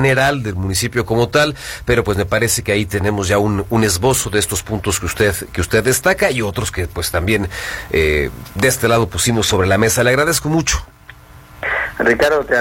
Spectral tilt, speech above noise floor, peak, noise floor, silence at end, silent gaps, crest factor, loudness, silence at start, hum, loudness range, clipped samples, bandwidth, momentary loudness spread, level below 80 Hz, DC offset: -4 dB/octave; 24 dB; 0 dBFS; -40 dBFS; 0 s; none; 16 dB; -16 LUFS; 0 s; none; 2 LU; under 0.1%; 16.5 kHz; 7 LU; -32 dBFS; under 0.1%